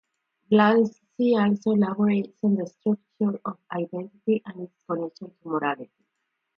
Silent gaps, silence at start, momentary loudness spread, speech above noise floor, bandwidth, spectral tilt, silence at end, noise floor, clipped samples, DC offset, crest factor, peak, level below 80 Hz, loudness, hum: none; 0.5 s; 13 LU; 55 dB; 6.6 kHz; -8.5 dB/octave; 0.75 s; -79 dBFS; under 0.1%; under 0.1%; 18 dB; -6 dBFS; -72 dBFS; -25 LUFS; none